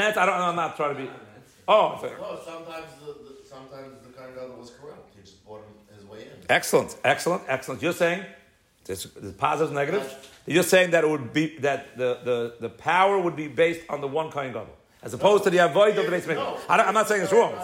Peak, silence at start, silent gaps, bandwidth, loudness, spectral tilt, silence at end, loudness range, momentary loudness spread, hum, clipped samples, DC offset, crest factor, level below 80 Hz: -6 dBFS; 0 s; none; 16 kHz; -23 LUFS; -4 dB/octave; 0 s; 17 LU; 22 LU; none; under 0.1%; under 0.1%; 18 dB; -66 dBFS